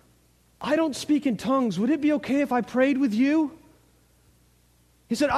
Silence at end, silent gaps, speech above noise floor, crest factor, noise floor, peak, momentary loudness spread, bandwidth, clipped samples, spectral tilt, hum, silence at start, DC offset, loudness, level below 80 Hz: 0 s; none; 38 dB; 16 dB; -61 dBFS; -10 dBFS; 4 LU; 13.5 kHz; under 0.1%; -5.5 dB/octave; 60 Hz at -55 dBFS; 0.6 s; under 0.1%; -24 LUFS; -62 dBFS